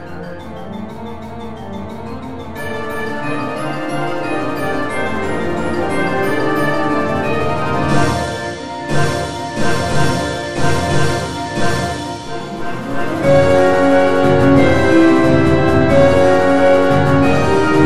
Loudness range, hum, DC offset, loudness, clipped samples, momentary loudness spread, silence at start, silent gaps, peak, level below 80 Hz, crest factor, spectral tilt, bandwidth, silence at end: 11 LU; none; 6%; -15 LUFS; under 0.1%; 17 LU; 0 s; none; 0 dBFS; -36 dBFS; 16 dB; -6 dB/octave; 13.5 kHz; 0 s